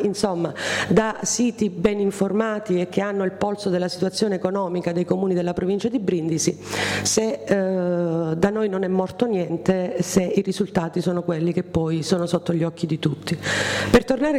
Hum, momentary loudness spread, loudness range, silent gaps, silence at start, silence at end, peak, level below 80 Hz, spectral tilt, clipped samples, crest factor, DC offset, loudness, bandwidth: none; 4 LU; 1 LU; none; 0 s; 0 s; -6 dBFS; -48 dBFS; -5 dB/octave; under 0.1%; 16 dB; under 0.1%; -22 LUFS; 16 kHz